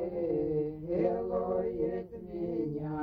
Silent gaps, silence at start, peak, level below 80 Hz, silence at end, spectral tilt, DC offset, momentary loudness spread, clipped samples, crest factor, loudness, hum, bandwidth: none; 0 s; -18 dBFS; -54 dBFS; 0 s; -11.5 dB/octave; under 0.1%; 6 LU; under 0.1%; 14 dB; -33 LUFS; none; 5 kHz